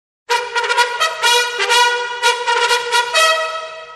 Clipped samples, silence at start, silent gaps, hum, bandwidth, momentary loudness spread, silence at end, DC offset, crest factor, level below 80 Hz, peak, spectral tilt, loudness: under 0.1%; 0.3 s; none; none; 12.5 kHz; 6 LU; 0 s; under 0.1%; 16 dB; -62 dBFS; -2 dBFS; 3 dB/octave; -15 LUFS